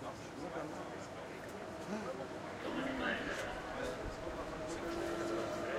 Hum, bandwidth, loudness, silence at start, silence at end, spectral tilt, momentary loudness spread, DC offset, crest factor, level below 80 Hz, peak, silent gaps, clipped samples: none; 16 kHz; -42 LUFS; 0 s; 0 s; -4.5 dB/octave; 9 LU; under 0.1%; 18 dB; -58 dBFS; -24 dBFS; none; under 0.1%